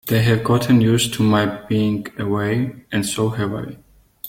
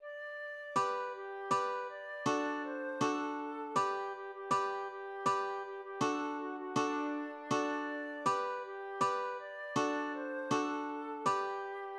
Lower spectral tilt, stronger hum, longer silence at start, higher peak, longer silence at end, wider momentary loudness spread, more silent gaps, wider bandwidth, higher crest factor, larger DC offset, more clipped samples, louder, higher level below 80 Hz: about the same, -5.5 dB/octave vs -4.5 dB/octave; neither; about the same, 0.05 s vs 0 s; first, -2 dBFS vs -20 dBFS; about the same, 0 s vs 0 s; about the same, 9 LU vs 8 LU; neither; first, 17 kHz vs 12 kHz; about the same, 16 dB vs 18 dB; neither; neither; first, -19 LUFS vs -37 LUFS; first, -48 dBFS vs -84 dBFS